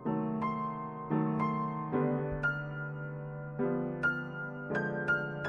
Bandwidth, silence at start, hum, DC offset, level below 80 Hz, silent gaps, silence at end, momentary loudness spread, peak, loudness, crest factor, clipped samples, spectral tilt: 6.6 kHz; 0 s; none; under 0.1%; -58 dBFS; none; 0 s; 8 LU; -18 dBFS; -34 LUFS; 16 dB; under 0.1%; -9 dB/octave